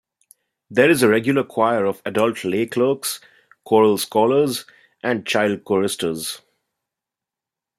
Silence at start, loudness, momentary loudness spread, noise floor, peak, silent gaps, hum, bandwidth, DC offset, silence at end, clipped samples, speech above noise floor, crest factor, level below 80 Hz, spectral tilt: 0.7 s; -19 LUFS; 11 LU; -87 dBFS; -2 dBFS; none; none; 16 kHz; under 0.1%; 1.4 s; under 0.1%; 68 dB; 18 dB; -64 dBFS; -4.5 dB/octave